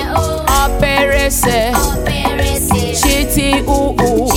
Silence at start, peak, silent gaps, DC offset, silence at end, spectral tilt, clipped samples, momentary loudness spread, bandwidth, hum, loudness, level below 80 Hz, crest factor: 0 s; 0 dBFS; none; under 0.1%; 0 s; -4 dB/octave; under 0.1%; 3 LU; 17 kHz; none; -13 LUFS; -20 dBFS; 12 dB